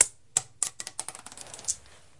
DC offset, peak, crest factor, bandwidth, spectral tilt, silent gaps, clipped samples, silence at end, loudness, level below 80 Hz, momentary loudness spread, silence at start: 0.2%; 0 dBFS; 32 dB; 11.5 kHz; 0.5 dB/octave; none; under 0.1%; 0.4 s; -30 LUFS; -66 dBFS; 14 LU; 0 s